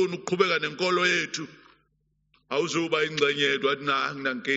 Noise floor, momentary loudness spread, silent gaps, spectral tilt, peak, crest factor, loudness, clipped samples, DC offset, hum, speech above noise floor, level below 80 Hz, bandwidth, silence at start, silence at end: -72 dBFS; 8 LU; none; -1.5 dB/octave; -6 dBFS; 20 dB; -25 LUFS; under 0.1%; under 0.1%; none; 46 dB; -72 dBFS; 8 kHz; 0 s; 0 s